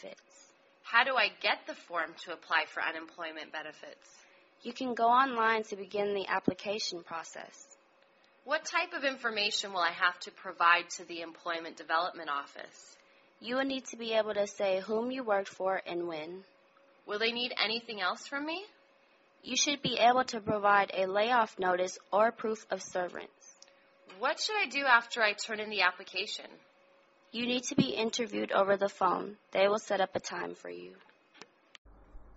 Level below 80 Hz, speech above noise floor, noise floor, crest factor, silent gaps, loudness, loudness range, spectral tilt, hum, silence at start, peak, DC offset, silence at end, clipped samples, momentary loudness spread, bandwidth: -72 dBFS; 33 dB; -66 dBFS; 24 dB; 31.78-31.85 s; -31 LUFS; 6 LU; -1 dB/octave; none; 0.05 s; -10 dBFS; under 0.1%; 0.05 s; under 0.1%; 16 LU; 8 kHz